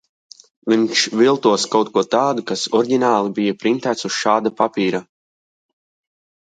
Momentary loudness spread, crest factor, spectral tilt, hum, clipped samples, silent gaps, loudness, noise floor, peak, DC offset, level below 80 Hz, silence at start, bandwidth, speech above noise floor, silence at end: 6 LU; 18 dB; -4 dB/octave; none; under 0.1%; none; -18 LUFS; under -90 dBFS; -2 dBFS; under 0.1%; -68 dBFS; 0.65 s; 9.4 kHz; over 73 dB; 1.45 s